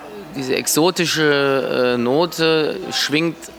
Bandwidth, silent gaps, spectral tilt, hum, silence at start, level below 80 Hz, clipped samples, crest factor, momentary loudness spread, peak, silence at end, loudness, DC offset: 19.5 kHz; none; -3.5 dB/octave; none; 0 s; -56 dBFS; under 0.1%; 16 dB; 5 LU; -2 dBFS; 0 s; -17 LUFS; under 0.1%